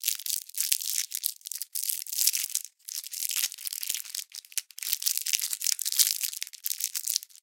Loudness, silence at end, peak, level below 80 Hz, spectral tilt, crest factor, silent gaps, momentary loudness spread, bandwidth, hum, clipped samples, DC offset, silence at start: -28 LUFS; 0.05 s; -2 dBFS; under -90 dBFS; 10 dB/octave; 30 dB; none; 10 LU; 17.5 kHz; none; under 0.1%; under 0.1%; 0 s